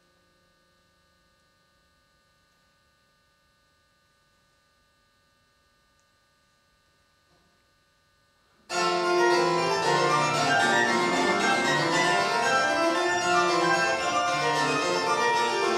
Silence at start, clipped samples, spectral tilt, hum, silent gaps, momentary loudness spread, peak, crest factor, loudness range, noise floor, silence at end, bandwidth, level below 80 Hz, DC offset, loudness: 8.7 s; under 0.1%; -3 dB/octave; none; none; 3 LU; -10 dBFS; 18 dB; 6 LU; -66 dBFS; 0 s; 15 kHz; -68 dBFS; under 0.1%; -23 LUFS